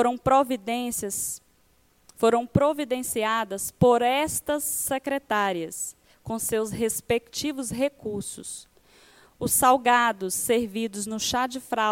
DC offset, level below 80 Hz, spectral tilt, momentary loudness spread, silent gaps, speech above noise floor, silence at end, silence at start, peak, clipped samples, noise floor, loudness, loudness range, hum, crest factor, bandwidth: under 0.1%; -54 dBFS; -3.5 dB/octave; 13 LU; none; 38 dB; 0 s; 0 s; -6 dBFS; under 0.1%; -63 dBFS; -25 LUFS; 5 LU; none; 20 dB; 17 kHz